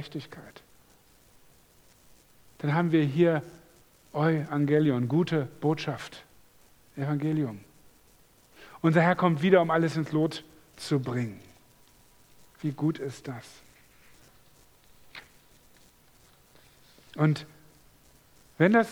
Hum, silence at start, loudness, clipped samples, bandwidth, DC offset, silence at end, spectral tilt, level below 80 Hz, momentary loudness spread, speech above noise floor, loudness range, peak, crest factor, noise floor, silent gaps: none; 0 s; -27 LUFS; under 0.1%; 19 kHz; under 0.1%; 0 s; -7.5 dB/octave; -66 dBFS; 24 LU; 33 dB; 11 LU; -6 dBFS; 24 dB; -60 dBFS; none